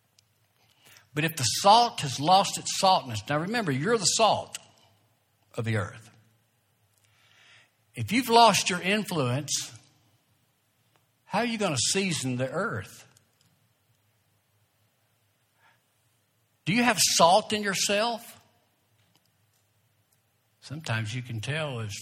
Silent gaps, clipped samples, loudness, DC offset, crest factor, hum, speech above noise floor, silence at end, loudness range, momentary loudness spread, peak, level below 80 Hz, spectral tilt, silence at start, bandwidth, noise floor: none; under 0.1%; -25 LUFS; under 0.1%; 24 dB; none; 45 dB; 0 s; 13 LU; 18 LU; -4 dBFS; -70 dBFS; -3 dB/octave; 1.15 s; 17.5 kHz; -70 dBFS